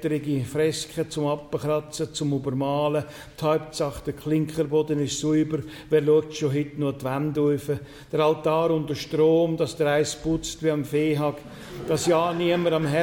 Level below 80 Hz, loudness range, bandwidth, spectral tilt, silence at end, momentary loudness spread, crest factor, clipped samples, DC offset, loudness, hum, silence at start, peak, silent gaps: -52 dBFS; 3 LU; 17.5 kHz; -5.5 dB/octave; 0 s; 7 LU; 14 dB; under 0.1%; under 0.1%; -25 LUFS; none; 0 s; -10 dBFS; none